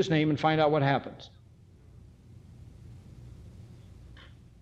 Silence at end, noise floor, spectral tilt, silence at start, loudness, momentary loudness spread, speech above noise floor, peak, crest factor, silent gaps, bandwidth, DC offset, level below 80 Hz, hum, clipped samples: 0.45 s; -55 dBFS; -7 dB/octave; 0 s; -26 LUFS; 27 LU; 29 dB; -12 dBFS; 20 dB; none; 8 kHz; under 0.1%; -56 dBFS; none; under 0.1%